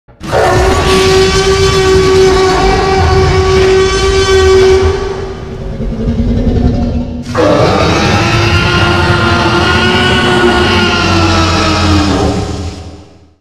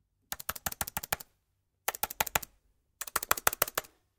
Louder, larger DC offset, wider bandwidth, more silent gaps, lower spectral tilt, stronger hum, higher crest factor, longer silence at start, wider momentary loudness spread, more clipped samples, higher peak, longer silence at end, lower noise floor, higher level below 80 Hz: first, -9 LUFS vs -33 LUFS; first, 1% vs under 0.1%; second, 13.5 kHz vs 19 kHz; neither; first, -5 dB/octave vs -0.5 dB/octave; neither; second, 8 dB vs 36 dB; about the same, 0.2 s vs 0.3 s; second, 10 LU vs 13 LU; neither; about the same, 0 dBFS vs 0 dBFS; about the same, 0.4 s vs 0.35 s; second, -34 dBFS vs -78 dBFS; first, -20 dBFS vs -58 dBFS